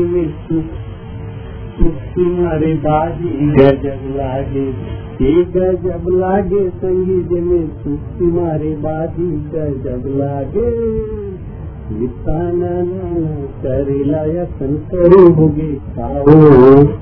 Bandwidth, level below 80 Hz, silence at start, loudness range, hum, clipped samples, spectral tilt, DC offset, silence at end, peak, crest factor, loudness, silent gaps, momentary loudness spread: 4.7 kHz; -28 dBFS; 0 s; 7 LU; none; 0.6%; -12 dB/octave; under 0.1%; 0 s; 0 dBFS; 14 dB; -14 LUFS; none; 17 LU